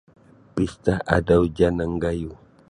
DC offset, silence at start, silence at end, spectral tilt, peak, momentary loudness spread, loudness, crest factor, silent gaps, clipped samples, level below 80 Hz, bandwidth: under 0.1%; 0.55 s; 0.35 s; -7.5 dB/octave; -2 dBFS; 12 LU; -22 LUFS; 20 dB; none; under 0.1%; -38 dBFS; 11 kHz